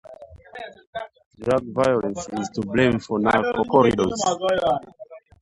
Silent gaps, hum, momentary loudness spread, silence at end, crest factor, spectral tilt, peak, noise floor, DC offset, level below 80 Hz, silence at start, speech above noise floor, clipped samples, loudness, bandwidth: 0.87-0.93 s, 1.26-1.31 s; none; 20 LU; 0.25 s; 20 dB; -5 dB/octave; -4 dBFS; -43 dBFS; under 0.1%; -50 dBFS; 0.1 s; 23 dB; under 0.1%; -21 LUFS; 11.5 kHz